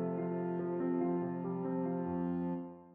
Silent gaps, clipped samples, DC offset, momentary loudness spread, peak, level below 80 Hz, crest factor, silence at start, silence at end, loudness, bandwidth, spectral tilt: none; under 0.1%; under 0.1%; 4 LU; -24 dBFS; -72 dBFS; 12 dB; 0 s; 0 s; -37 LUFS; 3.1 kHz; -10.5 dB/octave